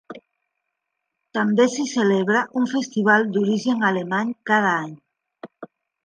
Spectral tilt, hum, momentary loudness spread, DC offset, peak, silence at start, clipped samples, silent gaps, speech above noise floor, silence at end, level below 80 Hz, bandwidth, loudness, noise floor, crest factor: -5 dB/octave; none; 8 LU; under 0.1%; -4 dBFS; 0.1 s; under 0.1%; none; 59 dB; 0.4 s; -74 dBFS; 9.8 kHz; -20 LUFS; -79 dBFS; 18 dB